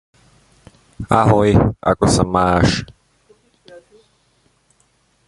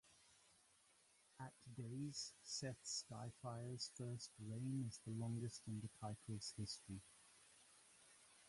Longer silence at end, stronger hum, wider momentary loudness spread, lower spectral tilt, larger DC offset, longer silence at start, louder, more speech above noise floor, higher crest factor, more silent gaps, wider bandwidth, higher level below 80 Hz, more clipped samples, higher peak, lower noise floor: first, 2.4 s vs 0 s; neither; second, 11 LU vs 19 LU; first, -6 dB/octave vs -4.5 dB/octave; neither; first, 1 s vs 0.05 s; first, -15 LUFS vs -51 LUFS; first, 46 dB vs 25 dB; about the same, 18 dB vs 18 dB; neither; about the same, 11.5 kHz vs 11.5 kHz; first, -34 dBFS vs -78 dBFS; neither; first, 0 dBFS vs -34 dBFS; second, -60 dBFS vs -75 dBFS